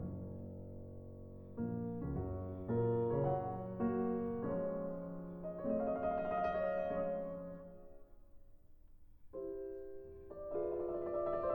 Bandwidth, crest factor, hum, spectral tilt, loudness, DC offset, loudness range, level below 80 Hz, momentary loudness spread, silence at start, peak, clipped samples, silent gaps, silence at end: 19 kHz; 16 dB; none; -11 dB/octave; -40 LUFS; under 0.1%; 9 LU; -58 dBFS; 16 LU; 0 s; -24 dBFS; under 0.1%; none; 0 s